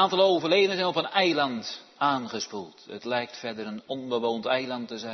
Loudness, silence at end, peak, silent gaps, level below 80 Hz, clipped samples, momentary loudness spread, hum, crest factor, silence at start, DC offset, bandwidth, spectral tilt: -27 LUFS; 0 s; -8 dBFS; none; -78 dBFS; under 0.1%; 14 LU; none; 18 dB; 0 s; under 0.1%; 6.4 kHz; -4 dB/octave